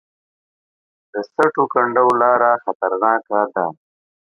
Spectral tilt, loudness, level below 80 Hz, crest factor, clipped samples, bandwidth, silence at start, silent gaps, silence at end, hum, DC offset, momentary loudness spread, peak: -7 dB/octave; -17 LUFS; -70 dBFS; 18 dB; under 0.1%; 11 kHz; 1.15 s; 2.75-2.80 s; 0.6 s; none; under 0.1%; 12 LU; -2 dBFS